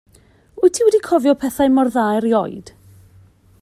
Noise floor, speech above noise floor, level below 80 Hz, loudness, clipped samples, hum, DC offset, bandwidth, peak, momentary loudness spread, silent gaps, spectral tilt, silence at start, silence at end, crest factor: -52 dBFS; 36 dB; -54 dBFS; -16 LUFS; under 0.1%; none; under 0.1%; 14.5 kHz; -2 dBFS; 5 LU; none; -5 dB/octave; 0.55 s; 0.95 s; 16 dB